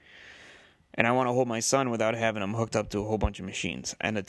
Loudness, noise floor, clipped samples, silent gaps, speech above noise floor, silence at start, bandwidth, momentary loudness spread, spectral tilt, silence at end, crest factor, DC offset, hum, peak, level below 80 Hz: -28 LUFS; -55 dBFS; under 0.1%; none; 27 dB; 0.15 s; 12.5 kHz; 8 LU; -4.5 dB/octave; 0.05 s; 24 dB; under 0.1%; none; -4 dBFS; -46 dBFS